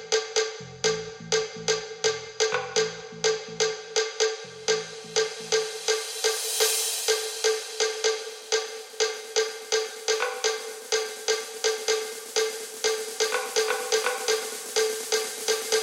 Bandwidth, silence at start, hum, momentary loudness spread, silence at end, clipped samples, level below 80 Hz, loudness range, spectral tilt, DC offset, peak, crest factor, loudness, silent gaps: 16.5 kHz; 0 s; none; 4 LU; 0 s; under 0.1%; -70 dBFS; 2 LU; 0 dB/octave; under 0.1%; -10 dBFS; 18 dB; -26 LUFS; none